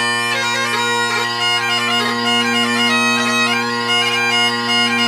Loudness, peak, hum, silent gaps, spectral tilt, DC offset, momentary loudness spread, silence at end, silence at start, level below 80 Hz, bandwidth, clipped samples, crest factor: -15 LUFS; -2 dBFS; none; none; -2 dB/octave; under 0.1%; 3 LU; 0 s; 0 s; -64 dBFS; 16 kHz; under 0.1%; 14 dB